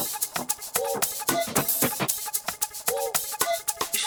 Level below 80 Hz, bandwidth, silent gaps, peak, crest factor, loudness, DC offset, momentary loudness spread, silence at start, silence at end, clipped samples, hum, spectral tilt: -62 dBFS; over 20 kHz; none; -6 dBFS; 22 dB; -26 LUFS; under 0.1%; 4 LU; 0 s; 0 s; under 0.1%; none; -1.5 dB/octave